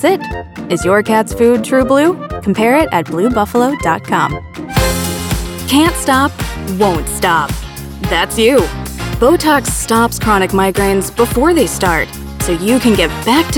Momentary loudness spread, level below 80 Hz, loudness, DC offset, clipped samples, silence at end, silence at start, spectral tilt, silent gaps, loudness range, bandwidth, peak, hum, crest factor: 9 LU; -28 dBFS; -13 LUFS; under 0.1%; under 0.1%; 0 s; 0 s; -4.5 dB/octave; none; 2 LU; 19.5 kHz; 0 dBFS; none; 12 dB